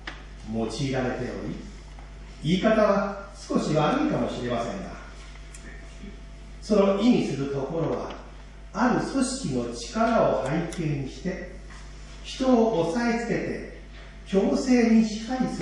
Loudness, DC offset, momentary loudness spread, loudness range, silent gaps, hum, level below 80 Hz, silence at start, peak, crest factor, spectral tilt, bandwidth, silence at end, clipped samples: -25 LUFS; under 0.1%; 22 LU; 3 LU; none; none; -44 dBFS; 0 s; -8 dBFS; 18 dB; -6 dB/octave; 11 kHz; 0 s; under 0.1%